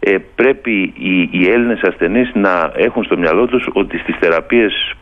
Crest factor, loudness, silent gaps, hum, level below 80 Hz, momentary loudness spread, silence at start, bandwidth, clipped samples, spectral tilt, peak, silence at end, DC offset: 14 dB; -14 LUFS; none; none; -40 dBFS; 4 LU; 0 s; 6 kHz; under 0.1%; -7.5 dB/octave; 0 dBFS; 0.05 s; under 0.1%